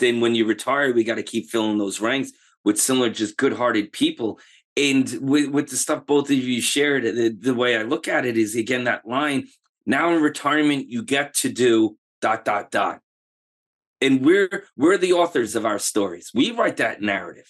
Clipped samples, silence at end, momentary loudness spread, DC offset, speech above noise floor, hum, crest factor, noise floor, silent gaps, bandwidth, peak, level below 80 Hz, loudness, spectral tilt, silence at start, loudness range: under 0.1%; 0.15 s; 7 LU; under 0.1%; over 69 dB; none; 14 dB; under -90 dBFS; 2.57-2.64 s, 4.64-4.76 s, 9.69-9.73 s, 11.98-12.22 s, 13.03-13.96 s; 12.5 kHz; -6 dBFS; -72 dBFS; -21 LUFS; -3.5 dB/octave; 0 s; 2 LU